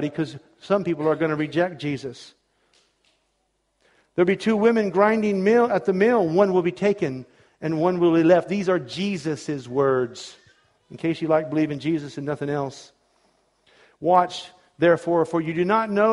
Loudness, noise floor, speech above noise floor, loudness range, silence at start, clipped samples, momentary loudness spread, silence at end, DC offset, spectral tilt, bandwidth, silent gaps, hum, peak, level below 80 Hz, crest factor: -22 LUFS; -71 dBFS; 50 dB; 7 LU; 0 s; under 0.1%; 12 LU; 0 s; under 0.1%; -7 dB/octave; 11.5 kHz; none; none; -4 dBFS; -64 dBFS; 20 dB